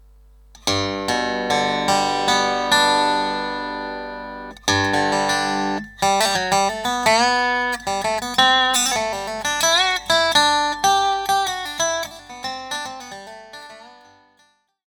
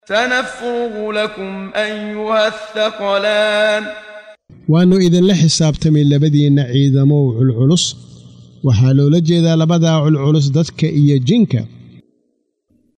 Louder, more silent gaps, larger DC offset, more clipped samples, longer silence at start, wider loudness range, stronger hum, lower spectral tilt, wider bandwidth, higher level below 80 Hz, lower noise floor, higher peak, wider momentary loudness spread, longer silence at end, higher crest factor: second, -19 LUFS vs -14 LUFS; neither; neither; neither; first, 0.65 s vs 0.1 s; about the same, 5 LU vs 5 LU; neither; second, -1.5 dB/octave vs -6 dB/octave; first, over 20 kHz vs 10 kHz; about the same, -50 dBFS vs -46 dBFS; second, -61 dBFS vs -65 dBFS; about the same, 0 dBFS vs -2 dBFS; first, 15 LU vs 9 LU; second, 0.95 s vs 1.3 s; first, 20 dB vs 12 dB